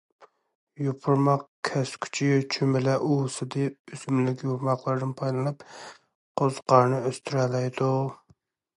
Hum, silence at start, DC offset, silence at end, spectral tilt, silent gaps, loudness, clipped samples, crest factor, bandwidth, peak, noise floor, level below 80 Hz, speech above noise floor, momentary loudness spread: none; 0.2 s; under 0.1%; 0.6 s; -6.5 dB/octave; 0.55-0.67 s, 1.48-1.63 s, 3.79-3.85 s, 6.15-6.35 s; -26 LUFS; under 0.1%; 22 dB; 11.5 kHz; -4 dBFS; -64 dBFS; -72 dBFS; 38 dB; 10 LU